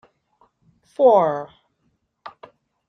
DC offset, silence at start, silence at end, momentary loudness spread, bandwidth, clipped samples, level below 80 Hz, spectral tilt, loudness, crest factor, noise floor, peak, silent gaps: under 0.1%; 1 s; 0.6 s; 27 LU; 6.4 kHz; under 0.1%; -70 dBFS; -7.5 dB/octave; -18 LUFS; 20 dB; -69 dBFS; -4 dBFS; none